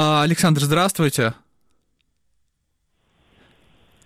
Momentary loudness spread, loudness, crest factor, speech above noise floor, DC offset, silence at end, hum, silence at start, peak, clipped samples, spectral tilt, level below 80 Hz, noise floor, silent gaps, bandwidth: 5 LU; -18 LUFS; 16 dB; 53 dB; under 0.1%; 2.7 s; none; 0 s; -6 dBFS; under 0.1%; -5 dB/octave; -56 dBFS; -71 dBFS; none; 16 kHz